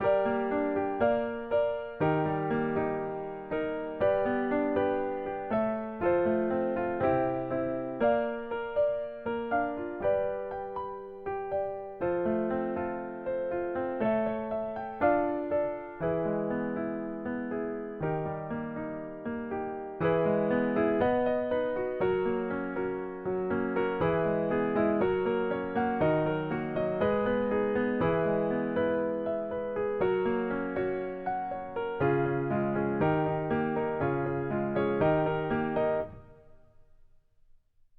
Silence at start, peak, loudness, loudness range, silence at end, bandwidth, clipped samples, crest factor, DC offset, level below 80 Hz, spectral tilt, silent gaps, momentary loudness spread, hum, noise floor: 0 s; -14 dBFS; -30 LUFS; 4 LU; 1.45 s; 4.7 kHz; under 0.1%; 16 dB; under 0.1%; -58 dBFS; -10.5 dB/octave; none; 8 LU; none; -60 dBFS